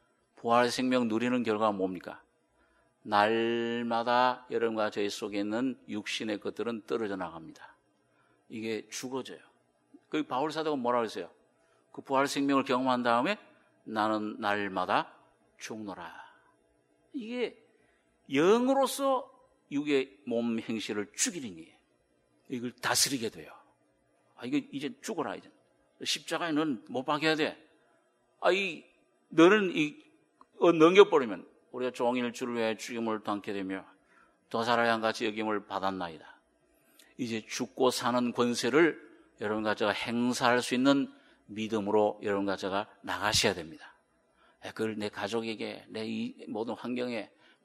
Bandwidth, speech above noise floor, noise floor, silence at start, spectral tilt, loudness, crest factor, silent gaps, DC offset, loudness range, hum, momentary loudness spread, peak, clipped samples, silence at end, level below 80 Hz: 13 kHz; 41 dB; -71 dBFS; 0.4 s; -3.5 dB/octave; -30 LUFS; 26 dB; none; under 0.1%; 9 LU; none; 15 LU; -6 dBFS; under 0.1%; 0.4 s; -72 dBFS